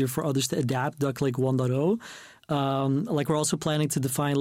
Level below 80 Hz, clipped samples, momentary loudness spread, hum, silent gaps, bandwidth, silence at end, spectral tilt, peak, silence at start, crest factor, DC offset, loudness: -62 dBFS; under 0.1%; 3 LU; none; none; 16.5 kHz; 0 s; -5.5 dB/octave; -14 dBFS; 0 s; 12 dB; under 0.1%; -27 LUFS